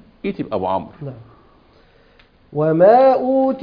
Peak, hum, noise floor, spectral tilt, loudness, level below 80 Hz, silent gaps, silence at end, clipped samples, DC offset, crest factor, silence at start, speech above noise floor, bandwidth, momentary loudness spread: -2 dBFS; none; -52 dBFS; -10 dB/octave; -16 LUFS; -54 dBFS; none; 0 s; under 0.1%; under 0.1%; 16 dB; 0.25 s; 36 dB; 5.2 kHz; 22 LU